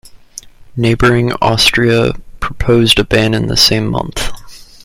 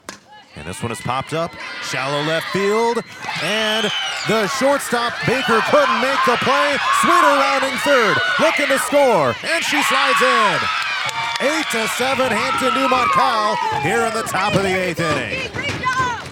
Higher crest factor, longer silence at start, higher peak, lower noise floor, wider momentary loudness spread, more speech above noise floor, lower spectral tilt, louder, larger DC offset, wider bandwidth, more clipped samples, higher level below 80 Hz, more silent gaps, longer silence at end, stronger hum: about the same, 14 dB vs 18 dB; about the same, 0.05 s vs 0.1 s; about the same, 0 dBFS vs 0 dBFS; second, -35 dBFS vs -39 dBFS; first, 18 LU vs 9 LU; about the same, 23 dB vs 22 dB; first, -4.5 dB/octave vs -3 dB/octave; first, -11 LUFS vs -17 LUFS; neither; about the same, 16.5 kHz vs 18 kHz; neither; first, -28 dBFS vs -56 dBFS; neither; first, 0.2 s vs 0 s; neither